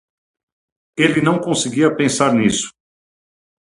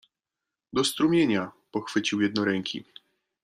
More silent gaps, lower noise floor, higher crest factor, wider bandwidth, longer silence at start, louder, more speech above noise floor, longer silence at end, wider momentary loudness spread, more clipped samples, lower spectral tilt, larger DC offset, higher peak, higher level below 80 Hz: neither; about the same, under -90 dBFS vs -88 dBFS; about the same, 18 dB vs 18 dB; second, 11.5 kHz vs 15 kHz; first, 0.95 s vs 0.75 s; first, -16 LUFS vs -26 LUFS; first, over 74 dB vs 62 dB; first, 0.9 s vs 0.6 s; second, 8 LU vs 12 LU; neither; about the same, -4.5 dB/octave vs -4.5 dB/octave; neither; first, 0 dBFS vs -10 dBFS; first, -54 dBFS vs -66 dBFS